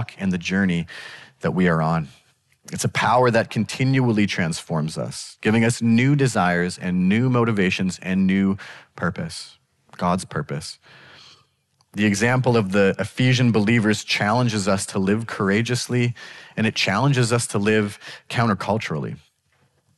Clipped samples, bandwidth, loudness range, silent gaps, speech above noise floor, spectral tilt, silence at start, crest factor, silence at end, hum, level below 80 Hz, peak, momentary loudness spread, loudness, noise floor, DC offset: under 0.1%; 12 kHz; 5 LU; none; 44 dB; -5.5 dB/octave; 0 s; 14 dB; 0.8 s; none; -56 dBFS; -8 dBFS; 13 LU; -21 LUFS; -65 dBFS; under 0.1%